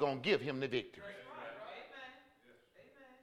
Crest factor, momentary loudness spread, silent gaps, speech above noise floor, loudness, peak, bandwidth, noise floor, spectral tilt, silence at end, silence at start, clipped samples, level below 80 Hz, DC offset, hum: 22 dB; 19 LU; none; 29 dB; -40 LUFS; -18 dBFS; 12 kHz; -67 dBFS; -6 dB/octave; 0.05 s; 0 s; under 0.1%; -80 dBFS; under 0.1%; none